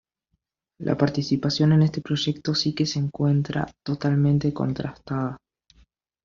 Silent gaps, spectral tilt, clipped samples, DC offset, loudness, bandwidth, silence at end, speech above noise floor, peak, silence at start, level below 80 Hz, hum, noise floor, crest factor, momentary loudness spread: none; -6.5 dB/octave; under 0.1%; under 0.1%; -24 LUFS; 7.4 kHz; 0.9 s; 53 dB; -4 dBFS; 0.8 s; -54 dBFS; none; -76 dBFS; 20 dB; 10 LU